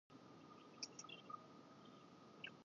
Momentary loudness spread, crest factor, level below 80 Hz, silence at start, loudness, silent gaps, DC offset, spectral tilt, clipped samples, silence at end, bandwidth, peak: 10 LU; 24 dB; under -90 dBFS; 0.1 s; -58 LUFS; none; under 0.1%; -2 dB/octave; under 0.1%; 0 s; 7.2 kHz; -34 dBFS